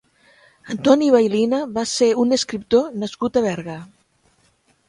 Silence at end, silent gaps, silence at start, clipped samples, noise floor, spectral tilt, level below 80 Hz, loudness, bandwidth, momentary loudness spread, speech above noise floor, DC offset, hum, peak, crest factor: 1.05 s; none; 0.65 s; under 0.1%; -61 dBFS; -4.5 dB/octave; -58 dBFS; -19 LUFS; 11.5 kHz; 13 LU; 43 dB; under 0.1%; none; 0 dBFS; 20 dB